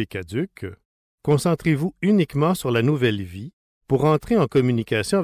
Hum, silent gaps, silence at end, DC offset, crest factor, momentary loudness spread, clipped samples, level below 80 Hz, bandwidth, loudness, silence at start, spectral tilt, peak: none; 0.85-1.18 s, 3.53-3.81 s; 0 s; under 0.1%; 12 dB; 14 LU; under 0.1%; -48 dBFS; 16 kHz; -21 LUFS; 0 s; -6.5 dB/octave; -8 dBFS